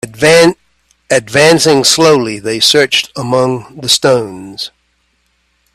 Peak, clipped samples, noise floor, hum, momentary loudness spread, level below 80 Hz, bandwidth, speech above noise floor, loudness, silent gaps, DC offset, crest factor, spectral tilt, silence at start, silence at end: 0 dBFS; 0.1%; -59 dBFS; none; 16 LU; -50 dBFS; 16.5 kHz; 49 dB; -9 LUFS; none; under 0.1%; 12 dB; -3 dB/octave; 0.05 s; 1.05 s